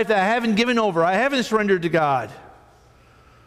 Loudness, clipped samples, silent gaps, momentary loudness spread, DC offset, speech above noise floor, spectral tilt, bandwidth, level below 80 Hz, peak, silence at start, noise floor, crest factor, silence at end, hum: -20 LUFS; under 0.1%; none; 3 LU; under 0.1%; 32 dB; -5 dB/octave; 15 kHz; -56 dBFS; -8 dBFS; 0 s; -52 dBFS; 14 dB; 1 s; none